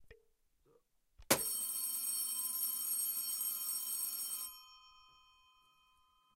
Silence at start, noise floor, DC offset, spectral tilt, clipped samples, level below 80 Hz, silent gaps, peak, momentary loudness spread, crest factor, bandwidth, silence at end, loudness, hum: 0 s; -74 dBFS; under 0.1%; -0.5 dB/octave; under 0.1%; -74 dBFS; none; -14 dBFS; 6 LU; 28 dB; 16 kHz; 1.35 s; -36 LUFS; none